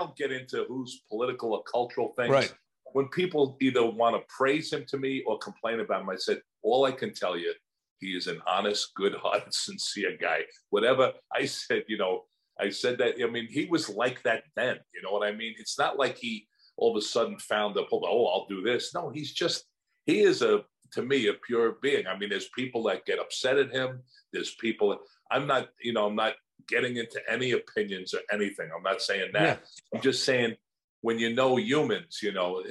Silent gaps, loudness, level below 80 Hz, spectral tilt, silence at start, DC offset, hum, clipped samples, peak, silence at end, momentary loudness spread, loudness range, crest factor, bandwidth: 7.91-7.96 s, 30.84-31.02 s; -29 LUFS; -78 dBFS; -4 dB/octave; 0 s; under 0.1%; none; under 0.1%; -10 dBFS; 0 s; 9 LU; 3 LU; 20 dB; 12.5 kHz